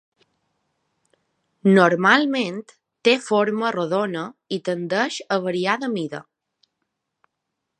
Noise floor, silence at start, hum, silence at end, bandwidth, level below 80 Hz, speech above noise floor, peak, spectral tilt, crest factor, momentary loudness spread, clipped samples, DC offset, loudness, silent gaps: -80 dBFS; 1.65 s; none; 1.6 s; 10 kHz; -76 dBFS; 59 dB; 0 dBFS; -5.5 dB/octave; 22 dB; 13 LU; under 0.1%; under 0.1%; -21 LUFS; none